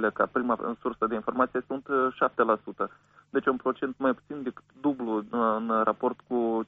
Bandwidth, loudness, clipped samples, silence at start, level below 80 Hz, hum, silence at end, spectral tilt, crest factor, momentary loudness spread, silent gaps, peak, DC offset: 4 kHz; -28 LUFS; under 0.1%; 0 s; -66 dBFS; none; 0.05 s; -4.5 dB/octave; 18 dB; 8 LU; none; -10 dBFS; under 0.1%